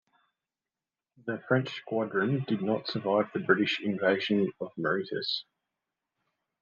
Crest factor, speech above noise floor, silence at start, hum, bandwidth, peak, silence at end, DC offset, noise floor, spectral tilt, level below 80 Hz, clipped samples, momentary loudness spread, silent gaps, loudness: 22 dB; over 61 dB; 1.25 s; none; 7.2 kHz; -8 dBFS; 1.2 s; under 0.1%; under -90 dBFS; -7 dB/octave; -78 dBFS; under 0.1%; 7 LU; none; -29 LUFS